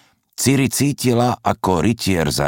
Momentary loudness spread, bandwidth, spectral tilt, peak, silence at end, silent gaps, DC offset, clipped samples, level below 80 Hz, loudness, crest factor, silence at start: 4 LU; 17 kHz; -5 dB/octave; -2 dBFS; 0 s; none; under 0.1%; under 0.1%; -42 dBFS; -18 LUFS; 16 dB; 0.4 s